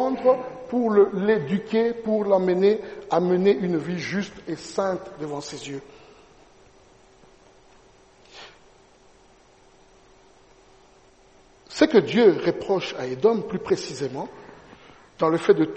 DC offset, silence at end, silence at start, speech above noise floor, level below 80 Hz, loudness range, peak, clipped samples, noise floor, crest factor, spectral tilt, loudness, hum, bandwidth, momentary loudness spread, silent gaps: under 0.1%; 0 s; 0 s; 33 dB; -60 dBFS; 14 LU; -4 dBFS; under 0.1%; -55 dBFS; 20 dB; -6 dB/octave; -23 LUFS; none; 8.4 kHz; 15 LU; none